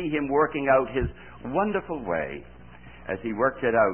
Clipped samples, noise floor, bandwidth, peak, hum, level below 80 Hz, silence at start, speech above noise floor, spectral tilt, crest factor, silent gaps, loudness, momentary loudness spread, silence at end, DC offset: under 0.1%; -47 dBFS; 3.3 kHz; -8 dBFS; none; -46 dBFS; 0 s; 22 dB; -11 dB/octave; 18 dB; none; -26 LUFS; 13 LU; 0 s; 0.3%